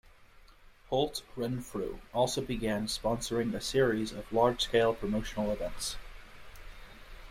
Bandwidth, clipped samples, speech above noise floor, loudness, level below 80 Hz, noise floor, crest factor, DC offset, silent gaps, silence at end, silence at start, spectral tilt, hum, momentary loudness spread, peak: 16 kHz; under 0.1%; 25 dB; -32 LUFS; -48 dBFS; -57 dBFS; 20 dB; under 0.1%; none; 0 s; 0.2 s; -4.5 dB/octave; none; 24 LU; -12 dBFS